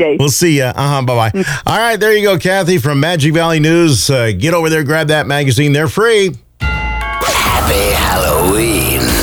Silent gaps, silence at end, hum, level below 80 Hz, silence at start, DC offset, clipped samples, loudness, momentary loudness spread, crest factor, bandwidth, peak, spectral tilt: none; 0 s; none; -26 dBFS; 0 s; under 0.1%; under 0.1%; -12 LUFS; 5 LU; 12 dB; over 20 kHz; 0 dBFS; -4.5 dB/octave